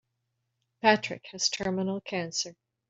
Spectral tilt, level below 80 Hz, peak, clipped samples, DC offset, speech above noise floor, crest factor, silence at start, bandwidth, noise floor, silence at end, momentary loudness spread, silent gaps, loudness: -3 dB/octave; -68 dBFS; -6 dBFS; under 0.1%; under 0.1%; 51 dB; 26 dB; 0.85 s; 8 kHz; -80 dBFS; 0.35 s; 9 LU; none; -29 LUFS